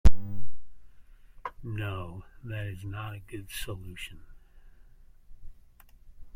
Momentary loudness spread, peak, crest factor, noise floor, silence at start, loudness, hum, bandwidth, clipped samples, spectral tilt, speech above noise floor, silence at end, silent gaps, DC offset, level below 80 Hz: 23 LU; -6 dBFS; 20 dB; -54 dBFS; 0.05 s; -38 LUFS; none; 16.5 kHz; under 0.1%; -5.5 dB/octave; 16 dB; 0.05 s; none; under 0.1%; -36 dBFS